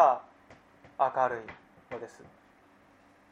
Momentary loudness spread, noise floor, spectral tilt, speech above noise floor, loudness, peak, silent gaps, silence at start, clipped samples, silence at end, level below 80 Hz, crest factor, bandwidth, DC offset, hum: 21 LU; -61 dBFS; -5.5 dB/octave; 32 dB; -31 LUFS; -8 dBFS; none; 0 s; under 0.1%; 1.25 s; -74 dBFS; 24 dB; 8.4 kHz; under 0.1%; none